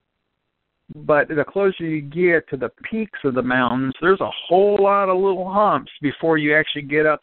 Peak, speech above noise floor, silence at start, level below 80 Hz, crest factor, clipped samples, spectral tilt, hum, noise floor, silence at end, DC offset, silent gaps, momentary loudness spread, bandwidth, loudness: -4 dBFS; 56 dB; 0.9 s; -56 dBFS; 16 dB; under 0.1%; -4 dB/octave; none; -75 dBFS; 0.05 s; under 0.1%; none; 10 LU; 4.3 kHz; -19 LUFS